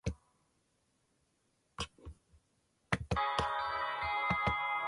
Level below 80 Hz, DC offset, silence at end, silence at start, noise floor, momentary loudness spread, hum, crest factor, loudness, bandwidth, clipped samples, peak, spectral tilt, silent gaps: -52 dBFS; under 0.1%; 0 s; 0.05 s; -77 dBFS; 22 LU; none; 24 dB; -35 LUFS; 11.5 kHz; under 0.1%; -16 dBFS; -4.5 dB/octave; none